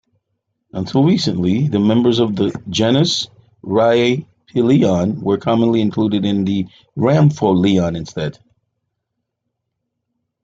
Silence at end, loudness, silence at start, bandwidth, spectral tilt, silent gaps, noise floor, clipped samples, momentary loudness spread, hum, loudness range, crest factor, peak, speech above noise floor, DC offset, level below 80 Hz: 2.15 s; -16 LUFS; 0.75 s; 7.8 kHz; -6.5 dB/octave; none; -76 dBFS; under 0.1%; 11 LU; none; 3 LU; 14 dB; -2 dBFS; 61 dB; under 0.1%; -52 dBFS